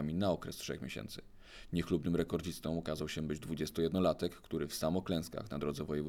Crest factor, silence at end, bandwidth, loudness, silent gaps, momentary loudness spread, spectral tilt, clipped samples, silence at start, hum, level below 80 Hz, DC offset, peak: 18 dB; 0 s; 17.5 kHz; -37 LUFS; none; 9 LU; -6 dB/octave; under 0.1%; 0 s; none; -56 dBFS; under 0.1%; -18 dBFS